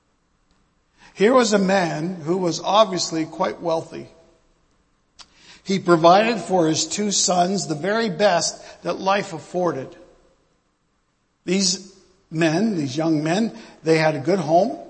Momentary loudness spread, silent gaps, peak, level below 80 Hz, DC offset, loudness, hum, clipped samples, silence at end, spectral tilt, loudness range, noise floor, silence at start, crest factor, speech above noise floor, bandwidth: 11 LU; none; 0 dBFS; -62 dBFS; under 0.1%; -20 LUFS; none; under 0.1%; 0 s; -4 dB/octave; 7 LU; -68 dBFS; 1.15 s; 20 dB; 48 dB; 8.8 kHz